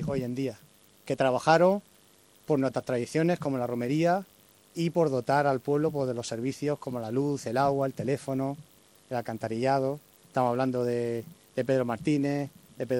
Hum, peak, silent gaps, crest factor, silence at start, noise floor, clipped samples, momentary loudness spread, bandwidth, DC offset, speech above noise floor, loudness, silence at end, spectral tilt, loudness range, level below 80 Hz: none; -8 dBFS; none; 20 dB; 0 s; -60 dBFS; under 0.1%; 9 LU; 16.5 kHz; under 0.1%; 32 dB; -29 LUFS; 0 s; -6.5 dB/octave; 3 LU; -64 dBFS